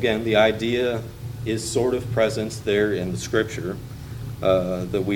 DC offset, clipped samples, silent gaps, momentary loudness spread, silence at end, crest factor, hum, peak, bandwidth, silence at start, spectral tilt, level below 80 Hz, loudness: under 0.1%; under 0.1%; none; 13 LU; 0 s; 20 dB; none; -4 dBFS; 18.5 kHz; 0 s; -5.5 dB/octave; -44 dBFS; -23 LUFS